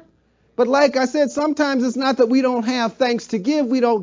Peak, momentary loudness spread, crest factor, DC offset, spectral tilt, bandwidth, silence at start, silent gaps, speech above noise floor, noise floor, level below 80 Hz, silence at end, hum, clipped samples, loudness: -4 dBFS; 5 LU; 14 dB; under 0.1%; -4.5 dB/octave; 7.6 kHz; 0.6 s; none; 42 dB; -59 dBFS; -64 dBFS; 0 s; none; under 0.1%; -19 LUFS